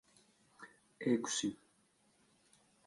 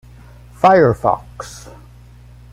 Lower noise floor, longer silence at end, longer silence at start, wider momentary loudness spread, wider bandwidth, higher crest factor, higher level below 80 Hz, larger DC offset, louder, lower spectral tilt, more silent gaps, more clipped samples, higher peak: first, -74 dBFS vs -41 dBFS; first, 1.3 s vs 0.95 s; about the same, 0.6 s vs 0.65 s; about the same, 24 LU vs 22 LU; second, 11.5 kHz vs 14 kHz; about the same, 22 dB vs 18 dB; second, -82 dBFS vs -42 dBFS; neither; second, -37 LUFS vs -14 LUFS; second, -3.5 dB/octave vs -6.5 dB/octave; neither; neither; second, -22 dBFS vs 0 dBFS